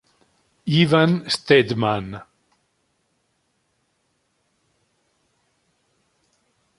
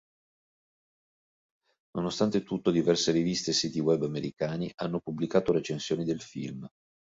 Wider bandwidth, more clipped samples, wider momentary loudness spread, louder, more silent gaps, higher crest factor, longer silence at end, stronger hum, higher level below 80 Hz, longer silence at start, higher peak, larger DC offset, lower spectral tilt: first, 11.5 kHz vs 7.8 kHz; neither; first, 17 LU vs 13 LU; first, -19 LUFS vs -29 LUFS; second, none vs 4.74-4.78 s; about the same, 22 dB vs 20 dB; first, 4.55 s vs 0.35 s; neither; first, -58 dBFS vs -64 dBFS; second, 0.65 s vs 1.95 s; first, -2 dBFS vs -10 dBFS; neither; about the same, -6 dB/octave vs -5 dB/octave